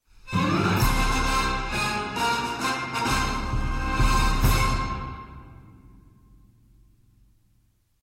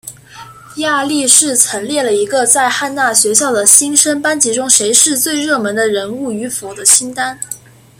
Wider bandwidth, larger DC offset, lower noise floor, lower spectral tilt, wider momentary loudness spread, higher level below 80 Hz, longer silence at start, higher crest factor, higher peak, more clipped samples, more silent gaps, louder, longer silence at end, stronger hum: second, 16.5 kHz vs over 20 kHz; neither; first, -65 dBFS vs -35 dBFS; first, -4.5 dB/octave vs -1 dB/octave; second, 9 LU vs 14 LU; first, -30 dBFS vs -58 dBFS; first, 0.25 s vs 0.05 s; about the same, 18 dB vs 14 dB; second, -8 dBFS vs 0 dBFS; second, under 0.1% vs 0.4%; neither; second, -25 LUFS vs -11 LUFS; first, 2.4 s vs 0.4 s; neither